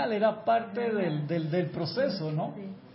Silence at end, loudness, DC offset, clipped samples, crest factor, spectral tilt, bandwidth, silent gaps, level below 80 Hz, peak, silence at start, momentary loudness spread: 0 s; -30 LUFS; under 0.1%; under 0.1%; 16 dB; -10.5 dB/octave; 5.8 kHz; none; -72 dBFS; -14 dBFS; 0 s; 6 LU